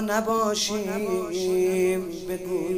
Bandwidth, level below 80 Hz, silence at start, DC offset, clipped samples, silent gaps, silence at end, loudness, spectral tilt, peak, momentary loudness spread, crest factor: 16 kHz; -54 dBFS; 0 s; under 0.1%; under 0.1%; none; 0 s; -25 LUFS; -4 dB/octave; -10 dBFS; 7 LU; 14 dB